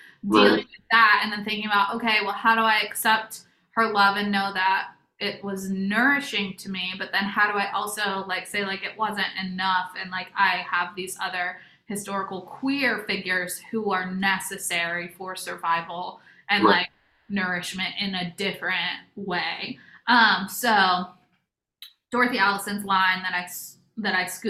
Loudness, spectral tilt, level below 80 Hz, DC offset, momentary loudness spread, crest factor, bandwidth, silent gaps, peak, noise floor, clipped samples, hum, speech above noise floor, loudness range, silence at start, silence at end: -24 LUFS; -3 dB/octave; -68 dBFS; under 0.1%; 13 LU; 20 dB; 16 kHz; none; -4 dBFS; -74 dBFS; under 0.1%; none; 49 dB; 5 LU; 0 s; 0 s